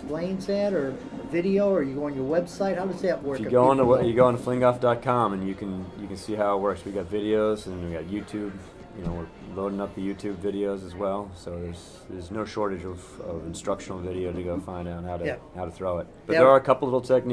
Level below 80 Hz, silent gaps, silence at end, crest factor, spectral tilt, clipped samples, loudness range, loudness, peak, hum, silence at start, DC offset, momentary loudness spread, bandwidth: -50 dBFS; none; 0 s; 22 dB; -7 dB/octave; under 0.1%; 10 LU; -26 LUFS; -4 dBFS; none; 0 s; under 0.1%; 16 LU; 11 kHz